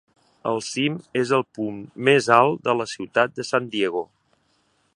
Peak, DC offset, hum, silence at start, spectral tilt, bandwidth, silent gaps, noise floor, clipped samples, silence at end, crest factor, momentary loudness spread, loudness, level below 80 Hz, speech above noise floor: 0 dBFS; under 0.1%; none; 0.45 s; -4.5 dB/octave; 11.5 kHz; none; -66 dBFS; under 0.1%; 0.9 s; 22 dB; 13 LU; -22 LUFS; -68 dBFS; 44 dB